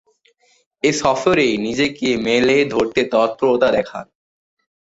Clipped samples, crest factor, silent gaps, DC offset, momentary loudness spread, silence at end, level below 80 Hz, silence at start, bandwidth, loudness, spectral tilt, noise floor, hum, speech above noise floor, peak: under 0.1%; 16 dB; none; under 0.1%; 5 LU; 0.85 s; -52 dBFS; 0.85 s; 8 kHz; -17 LUFS; -4.5 dB/octave; -58 dBFS; none; 41 dB; -2 dBFS